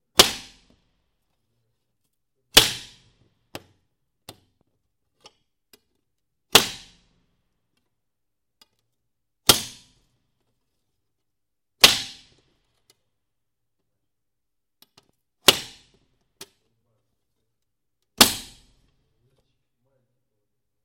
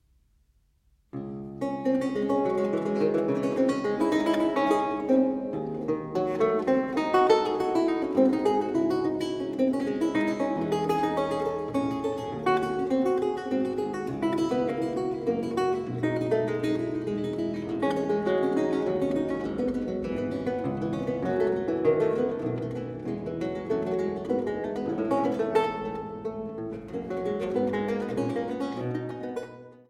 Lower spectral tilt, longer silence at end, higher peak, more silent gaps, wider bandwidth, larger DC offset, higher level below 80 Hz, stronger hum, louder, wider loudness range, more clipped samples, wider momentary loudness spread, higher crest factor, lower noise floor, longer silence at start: second, -0.5 dB/octave vs -7 dB/octave; first, 2.4 s vs 0.15 s; first, 0 dBFS vs -10 dBFS; neither; first, 16.5 kHz vs 14 kHz; neither; about the same, -54 dBFS vs -58 dBFS; neither; first, -18 LUFS vs -28 LUFS; about the same, 4 LU vs 5 LU; neither; first, 21 LU vs 9 LU; first, 28 dB vs 18 dB; first, -85 dBFS vs -66 dBFS; second, 0.2 s vs 1.15 s